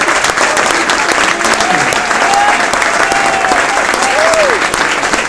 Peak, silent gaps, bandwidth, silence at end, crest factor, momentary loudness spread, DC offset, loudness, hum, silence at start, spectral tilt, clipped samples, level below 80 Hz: 0 dBFS; none; 11 kHz; 0 s; 10 dB; 2 LU; under 0.1%; -10 LUFS; none; 0 s; -1.5 dB/octave; 0.5%; -40 dBFS